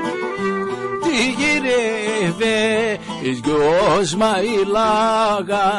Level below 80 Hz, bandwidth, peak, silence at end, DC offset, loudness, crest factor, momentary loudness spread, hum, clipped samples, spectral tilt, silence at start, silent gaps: -48 dBFS; 11.5 kHz; -8 dBFS; 0 s; under 0.1%; -18 LUFS; 10 dB; 7 LU; none; under 0.1%; -4 dB/octave; 0 s; none